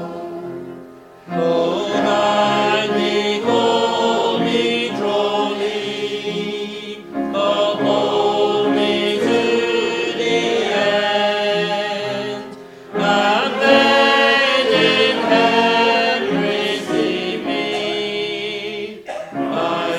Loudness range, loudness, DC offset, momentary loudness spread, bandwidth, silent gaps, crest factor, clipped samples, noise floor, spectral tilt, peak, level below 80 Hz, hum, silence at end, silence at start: 6 LU; -17 LUFS; under 0.1%; 13 LU; 15 kHz; none; 18 dB; under 0.1%; -39 dBFS; -4 dB/octave; 0 dBFS; -60 dBFS; none; 0 s; 0 s